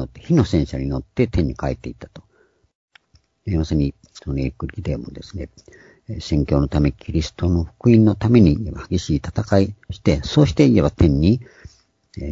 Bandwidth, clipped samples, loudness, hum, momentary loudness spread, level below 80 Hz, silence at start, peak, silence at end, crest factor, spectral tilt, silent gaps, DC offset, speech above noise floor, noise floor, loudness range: 7.8 kHz; under 0.1%; -19 LUFS; none; 19 LU; -32 dBFS; 0 s; 0 dBFS; 0 s; 18 dB; -7.5 dB/octave; 2.75-2.88 s; under 0.1%; 41 dB; -60 dBFS; 9 LU